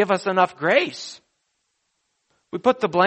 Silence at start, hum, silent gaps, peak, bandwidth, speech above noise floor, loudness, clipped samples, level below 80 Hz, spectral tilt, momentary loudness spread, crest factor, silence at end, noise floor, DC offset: 0 s; none; none; -4 dBFS; 8.4 kHz; 53 dB; -21 LUFS; under 0.1%; -68 dBFS; -5 dB/octave; 16 LU; 20 dB; 0 s; -73 dBFS; under 0.1%